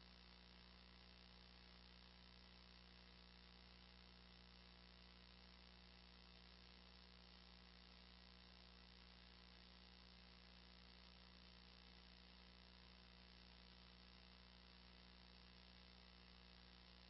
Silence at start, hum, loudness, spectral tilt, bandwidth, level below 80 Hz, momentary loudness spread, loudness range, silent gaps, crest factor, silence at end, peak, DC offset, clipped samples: 0 s; 60 Hz at -70 dBFS; -65 LUFS; -2.5 dB/octave; 5.8 kHz; -70 dBFS; 1 LU; 0 LU; none; 18 dB; 0 s; -48 dBFS; under 0.1%; under 0.1%